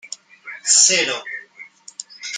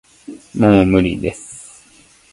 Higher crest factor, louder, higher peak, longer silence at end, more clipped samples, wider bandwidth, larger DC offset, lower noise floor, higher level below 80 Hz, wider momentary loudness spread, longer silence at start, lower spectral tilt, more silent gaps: about the same, 22 dB vs 18 dB; about the same, -15 LUFS vs -15 LUFS; about the same, 0 dBFS vs 0 dBFS; second, 0 s vs 0.7 s; neither; about the same, 11 kHz vs 11.5 kHz; neither; second, -43 dBFS vs -49 dBFS; second, -78 dBFS vs -38 dBFS; about the same, 24 LU vs 24 LU; second, 0.05 s vs 0.3 s; second, 1.5 dB/octave vs -7 dB/octave; neither